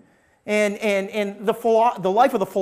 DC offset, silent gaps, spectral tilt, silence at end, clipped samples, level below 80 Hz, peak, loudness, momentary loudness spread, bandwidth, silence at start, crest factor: under 0.1%; none; -5 dB/octave; 0 s; under 0.1%; -64 dBFS; -6 dBFS; -21 LUFS; 6 LU; 15.5 kHz; 0.45 s; 16 dB